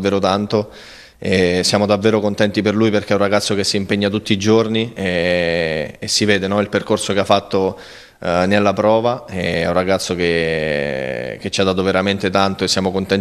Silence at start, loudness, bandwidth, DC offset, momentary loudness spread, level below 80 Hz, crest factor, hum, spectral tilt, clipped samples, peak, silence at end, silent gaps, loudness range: 0 s; -17 LUFS; 13.5 kHz; under 0.1%; 7 LU; -48 dBFS; 16 dB; none; -4.5 dB/octave; under 0.1%; 0 dBFS; 0 s; none; 2 LU